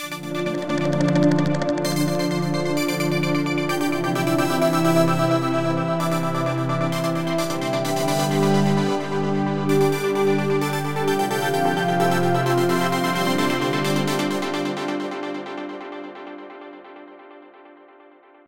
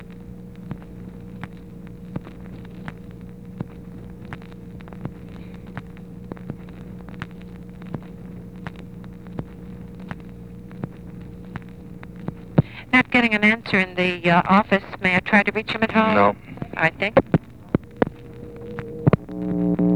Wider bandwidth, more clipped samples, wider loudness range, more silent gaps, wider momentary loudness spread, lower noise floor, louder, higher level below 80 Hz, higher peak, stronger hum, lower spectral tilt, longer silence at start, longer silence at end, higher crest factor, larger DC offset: first, 17 kHz vs 10.5 kHz; neither; second, 6 LU vs 19 LU; neither; second, 11 LU vs 22 LU; first, -50 dBFS vs -38 dBFS; about the same, -22 LUFS vs -20 LUFS; second, -56 dBFS vs -46 dBFS; second, -6 dBFS vs 0 dBFS; neither; second, -5.5 dB/octave vs -7.5 dB/octave; about the same, 0 s vs 0 s; first, 0.65 s vs 0 s; second, 16 dB vs 24 dB; second, under 0.1% vs 0.3%